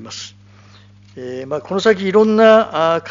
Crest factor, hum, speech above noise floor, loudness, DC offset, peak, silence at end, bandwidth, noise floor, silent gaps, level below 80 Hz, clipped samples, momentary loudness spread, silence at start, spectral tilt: 16 dB; 50 Hz at -40 dBFS; 30 dB; -14 LUFS; under 0.1%; 0 dBFS; 0 s; 7.6 kHz; -44 dBFS; none; -60 dBFS; under 0.1%; 20 LU; 0 s; -3.5 dB/octave